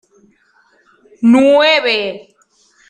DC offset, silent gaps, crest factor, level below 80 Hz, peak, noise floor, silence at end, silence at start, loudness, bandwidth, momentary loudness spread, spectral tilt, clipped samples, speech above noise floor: under 0.1%; none; 14 dB; -60 dBFS; -2 dBFS; -54 dBFS; 0.7 s; 1.2 s; -11 LUFS; 9.4 kHz; 14 LU; -4.5 dB/octave; under 0.1%; 44 dB